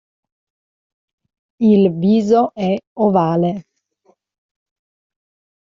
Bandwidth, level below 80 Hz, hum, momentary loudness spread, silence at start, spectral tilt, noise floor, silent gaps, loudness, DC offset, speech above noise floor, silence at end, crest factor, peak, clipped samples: 7.4 kHz; -60 dBFS; none; 8 LU; 1.6 s; -8 dB/octave; -60 dBFS; 2.87-2.96 s; -16 LUFS; under 0.1%; 45 dB; 2.05 s; 16 dB; -4 dBFS; under 0.1%